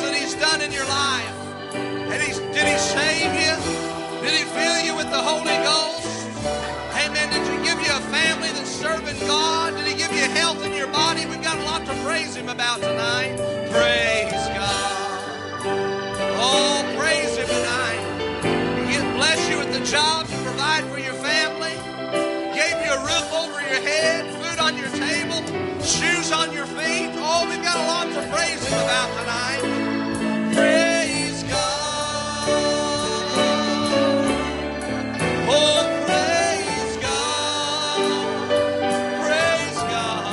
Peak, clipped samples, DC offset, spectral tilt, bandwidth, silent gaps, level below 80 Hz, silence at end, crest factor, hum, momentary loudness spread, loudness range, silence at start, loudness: -6 dBFS; under 0.1%; under 0.1%; -2.5 dB/octave; 11.5 kHz; none; -50 dBFS; 0 s; 18 dB; none; 7 LU; 2 LU; 0 s; -21 LUFS